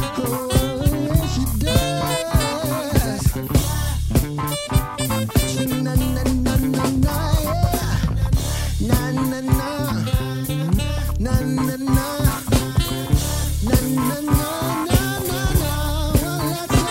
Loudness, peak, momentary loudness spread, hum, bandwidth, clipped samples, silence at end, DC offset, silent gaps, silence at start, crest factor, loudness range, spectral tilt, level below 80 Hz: -21 LUFS; -2 dBFS; 4 LU; none; 16.5 kHz; under 0.1%; 0 s; under 0.1%; none; 0 s; 16 dB; 1 LU; -5.5 dB/octave; -26 dBFS